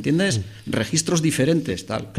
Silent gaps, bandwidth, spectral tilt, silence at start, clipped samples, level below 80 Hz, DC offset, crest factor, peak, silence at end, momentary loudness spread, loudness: none; 15 kHz; -4.5 dB/octave; 0 s; under 0.1%; -50 dBFS; under 0.1%; 16 dB; -6 dBFS; 0 s; 8 LU; -22 LUFS